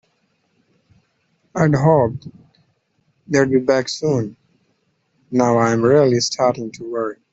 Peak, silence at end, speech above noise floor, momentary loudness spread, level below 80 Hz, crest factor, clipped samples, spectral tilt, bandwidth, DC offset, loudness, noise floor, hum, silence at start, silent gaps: -2 dBFS; 0.2 s; 49 dB; 12 LU; -56 dBFS; 16 dB; under 0.1%; -6 dB/octave; 8 kHz; under 0.1%; -17 LUFS; -66 dBFS; none; 1.55 s; none